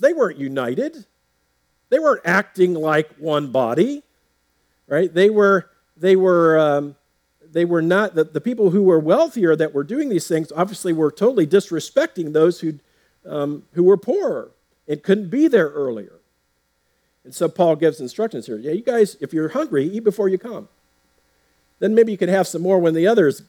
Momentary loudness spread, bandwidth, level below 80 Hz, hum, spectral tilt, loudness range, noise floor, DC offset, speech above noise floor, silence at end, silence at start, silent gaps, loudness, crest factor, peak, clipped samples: 10 LU; 17 kHz; -72 dBFS; none; -6.5 dB/octave; 4 LU; -67 dBFS; under 0.1%; 50 dB; 0.1 s; 0 s; none; -19 LUFS; 18 dB; 0 dBFS; under 0.1%